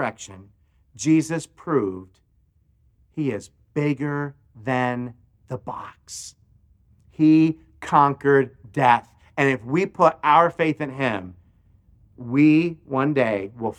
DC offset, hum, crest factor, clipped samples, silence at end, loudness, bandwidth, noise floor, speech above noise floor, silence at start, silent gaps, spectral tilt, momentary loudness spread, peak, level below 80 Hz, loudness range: under 0.1%; none; 20 dB; under 0.1%; 0.05 s; -21 LUFS; 11 kHz; -62 dBFS; 41 dB; 0 s; none; -6.5 dB/octave; 19 LU; -2 dBFS; -60 dBFS; 9 LU